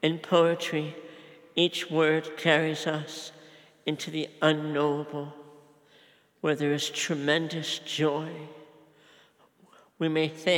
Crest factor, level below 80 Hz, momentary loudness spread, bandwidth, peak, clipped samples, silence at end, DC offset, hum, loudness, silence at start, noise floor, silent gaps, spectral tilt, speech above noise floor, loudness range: 22 dB; -90 dBFS; 15 LU; 17.5 kHz; -8 dBFS; under 0.1%; 0 s; under 0.1%; none; -28 LUFS; 0 s; -61 dBFS; none; -4.5 dB/octave; 34 dB; 4 LU